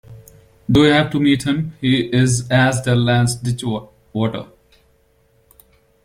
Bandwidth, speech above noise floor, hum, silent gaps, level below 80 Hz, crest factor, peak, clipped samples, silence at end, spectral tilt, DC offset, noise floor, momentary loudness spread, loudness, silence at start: 15.5 kHz; 42 dB; none; none; -46 dBFS; 16 dB; -2 dBFS; under 0.1%; 1.6 s; -5.5 dB/octave; under 0.1%; -58 dBFS; 11 LU; -17 LUFS; 0.1 s